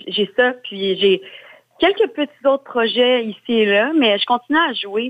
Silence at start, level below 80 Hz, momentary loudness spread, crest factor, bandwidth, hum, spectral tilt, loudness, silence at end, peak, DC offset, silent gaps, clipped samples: 0.05 s; -62 dBFS; 5 LU; 14 dB; 8.2 kHz; none; -6 dB/octave; -17 LUFS; 0 s; -4 dBFS; under 0.1%; none; under 0.1%